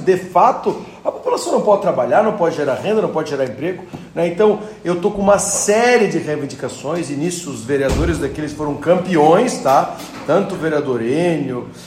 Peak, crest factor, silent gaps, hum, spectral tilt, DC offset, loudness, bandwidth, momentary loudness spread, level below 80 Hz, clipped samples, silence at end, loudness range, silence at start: 0 dBFS; 16 dB; none; none; -5 dB/octave; under 0.1%; -17 LUFS; 16 kHz; 11 LU; -38 dBFS; under 0.1%; 0 s; 2 LU; 0 s